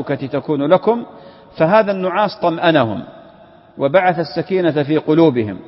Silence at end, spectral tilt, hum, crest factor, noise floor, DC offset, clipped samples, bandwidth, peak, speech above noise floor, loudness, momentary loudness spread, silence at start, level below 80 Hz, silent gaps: 0.05 s; -11 dB/octave; none; 16 dB; -44 dBFS; under 0.1%; under 0.1%; 5.8 kHz; 0 dBFS; 29 dB; -16 LUFS; 8 LU; 0 s; -58 dBFS; none